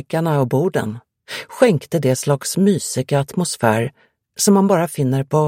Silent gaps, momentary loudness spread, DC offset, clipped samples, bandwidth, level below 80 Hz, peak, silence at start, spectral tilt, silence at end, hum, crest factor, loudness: none; 14 LU; under 0.1%; under 0.1%; 16.5 kHz; -58 dBFS; 0 dBFS; 0.1 s; -5.5 dB/octave; 0 s; none; 18 dB; -18 LUFS